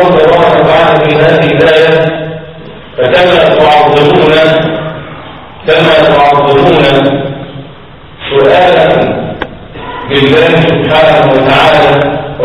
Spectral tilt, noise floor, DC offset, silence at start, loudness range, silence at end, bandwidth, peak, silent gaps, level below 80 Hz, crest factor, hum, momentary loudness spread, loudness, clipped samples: -6.5 dB/octave; -31 dBFS; 1%; 0 s; 2 LU; 0 s; 11 kHz; 0 dBFS; none; -34 dBFS; 6 dB; none; 17 LU; -6 LUFS; 3%